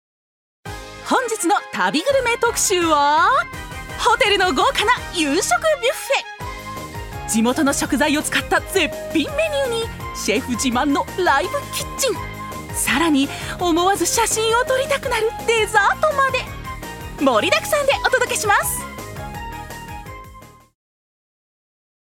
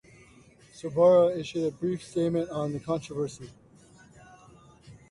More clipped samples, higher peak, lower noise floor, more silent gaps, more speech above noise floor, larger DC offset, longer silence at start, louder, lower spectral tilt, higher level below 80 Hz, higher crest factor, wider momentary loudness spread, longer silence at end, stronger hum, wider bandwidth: neither; first, -2 dBFS vs -12 dBFS; second, -42 dBFS vs -56 dBFS; neither; second, 24 dB vs 30 dB; neither; about the same, 0.65 s vs 0.75 s; first, -18 LUFS vs -27 LUFS; second, -2.5 dB/octave vs -7 dB/octave; first, -40 dBFS vs -62 dBFS; about the same, 18 dB vs 18 dB; about the same, 15 LU vs 16 LU; first, 1.55 s vs 0.2 s; neither; first, 18.5 kHz vs 11.5 kHz